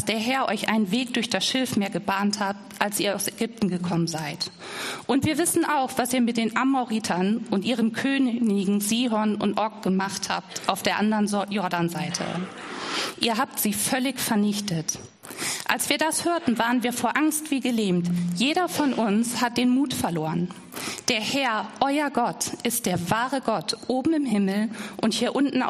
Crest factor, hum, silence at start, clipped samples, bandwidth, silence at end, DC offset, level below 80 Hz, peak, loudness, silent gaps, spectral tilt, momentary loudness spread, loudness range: 22 dB; none; 0 s; under 0.1%; 14.5 kHz; 0 s; under 0.1%; -64 dBFS; -2 dBFS; -25 LUFS; none; -4 dB/octave; 6 LU; 2 LU